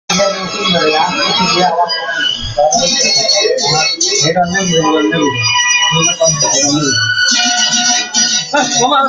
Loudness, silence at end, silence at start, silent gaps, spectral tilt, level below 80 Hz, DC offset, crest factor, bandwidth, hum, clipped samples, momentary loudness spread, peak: -10 LUFS; 0 s; 0.1 s; none; -2 dB/octave; -44 dBFS; under 0.1%; 12 dB; 13 kHz; none; under 0.1%; 4 LU; 0 dBFS